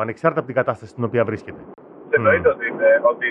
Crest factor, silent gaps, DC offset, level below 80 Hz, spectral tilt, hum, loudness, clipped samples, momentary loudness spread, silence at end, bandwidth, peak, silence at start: 18 dB; none; under 0.1%; -56 dBFS; -8 dB/octave; none; -19 LUFS; under 0.1%; 10 LU; 0 s; 7.4 kHz; -2 dBFS; 0 s